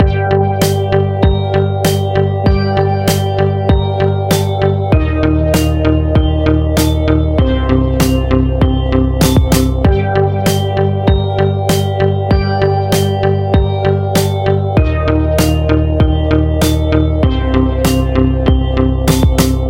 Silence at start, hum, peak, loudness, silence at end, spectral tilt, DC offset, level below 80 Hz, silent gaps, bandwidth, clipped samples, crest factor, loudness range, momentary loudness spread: 0 s; none; 0 dBFS; -13 LUFS; 0 s; -6.5 dB/octave; under 0.1%; -18 dBFS; none; 17 kHz; under 0.1%; 12 dB; 1 LU; 2 LU